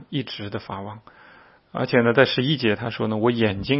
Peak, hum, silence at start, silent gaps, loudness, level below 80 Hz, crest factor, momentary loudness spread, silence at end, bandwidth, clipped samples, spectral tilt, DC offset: -2 dBFS; none; 0 s; none; -22 LUFS; -54 dBFS; 22 dB; 16 LU; 0 s; 5.8 kHz; under 0.1%; -10 dB/octave; under 0.1%